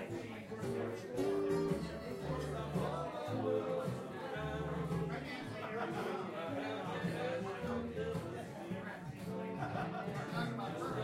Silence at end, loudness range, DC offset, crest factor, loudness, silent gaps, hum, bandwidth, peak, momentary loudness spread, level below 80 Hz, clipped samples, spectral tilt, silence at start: 0 s; 3 LU; under 0.1%; 18 dB; -41 LUFS; none; none; 16 kHz; -22 dBFS; 7 LU; -62 dBFS; under 0.1%; -6.5 dB/octave; 0 s